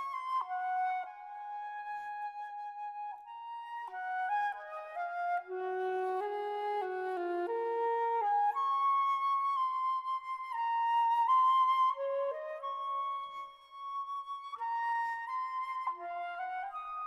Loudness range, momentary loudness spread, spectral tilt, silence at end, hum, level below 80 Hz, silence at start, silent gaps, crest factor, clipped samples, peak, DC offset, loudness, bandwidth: 9 LU; 13 LU; -2.5 dB/octave; 0 s; none; -84 dBFS; 0 s; none; 14 dB; under 0.1%; -20 dBFS; under 0.1%; -34 LUFS; 12 kHz